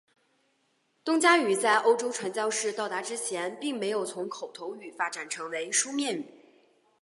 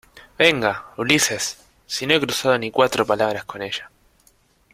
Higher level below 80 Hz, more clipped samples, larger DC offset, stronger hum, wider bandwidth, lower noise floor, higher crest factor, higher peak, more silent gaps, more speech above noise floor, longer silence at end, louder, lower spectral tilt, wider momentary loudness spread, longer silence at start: second, -86 dBFS vs -58 dBFS; neither; neither; neither; second, 11.5 kHz vs 16 kHz; first, -72 dBFS vs -59 dBFS; about the same, 22 dB vs 20 dB; second, -8 dBFS vs -2 dBFS; neither; first, 44 dB vs 38 dB; second, 0.7 s vs 0.85 s; second, -28 LUFS vs -20 LUFS; about the same, -2 dB/octave vs -2.5 dB/octave; first, 15 LU vs 12 LU; first, 1.05 s vs 0.15 s